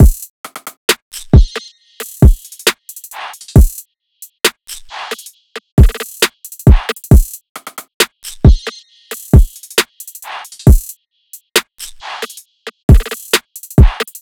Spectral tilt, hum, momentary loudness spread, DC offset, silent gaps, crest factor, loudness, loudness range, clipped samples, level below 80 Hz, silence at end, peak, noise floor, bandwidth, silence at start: -5 dB/octave; none; 18 LU; under 0.1%; 0.30-0.44 s, 0.77-0.88 s, 1.02-1.11 s, 5.72-5.77 s, 7.49-7.55 s, 7.94-8.00 s, 12.83-12.88 s; 12 dB; -13 LUFS; 4 LU; 3%; -16 dBFS; 0.2 s; 0 dBFS; -41 dBFS; 20 kHz; 0 s